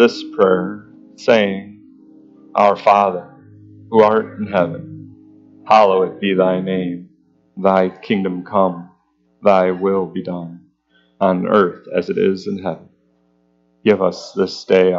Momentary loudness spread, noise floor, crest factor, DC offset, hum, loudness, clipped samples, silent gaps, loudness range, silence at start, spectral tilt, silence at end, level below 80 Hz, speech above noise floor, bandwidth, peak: 14 LU; -60 dBFS; 18 dB; under 0.1%; none; -17 LUFS; under 0.1%; none; 3 LU; 0 s; -7 dB/octave; 0 s; -64 dBFS; 44 dB; 7.6 kHz; 0 dBFS